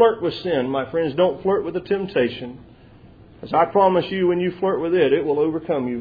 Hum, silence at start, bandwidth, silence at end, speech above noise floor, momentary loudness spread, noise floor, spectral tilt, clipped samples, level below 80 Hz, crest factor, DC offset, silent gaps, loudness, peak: none; 0 s; 5 kHz; 0 s; 27 dB; 7 LU; -46 dBFS; -9 dB/octave; under 0.1%; -54 dBFS; 18 dB; under 0.1%; none; -21 LUFS; -2 dBFS